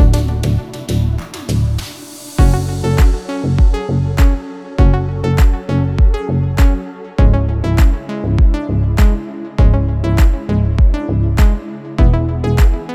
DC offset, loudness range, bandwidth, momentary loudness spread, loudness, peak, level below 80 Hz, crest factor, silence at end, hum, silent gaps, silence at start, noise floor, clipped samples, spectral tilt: under 0.1%; 2 LU; 13.5 kHz; 8 LU; -15 LUFS; 0 dBFS; -14 dBFS; 12 dB; 0 s; none; none; 0 s; -32 dBFS; under 0.1%; -7 dB/octave